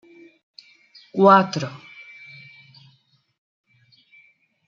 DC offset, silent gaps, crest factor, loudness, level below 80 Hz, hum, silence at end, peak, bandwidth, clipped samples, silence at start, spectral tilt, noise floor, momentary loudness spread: under 0.1%; none; 22 dB; -18 LUFS; -72 dBFS; none; 2.9 s; -2 dBFS; 7.4 kHz; under 0.1%; 1.15 s; -6.5 dB/octave; -62 dBFS; 27 LU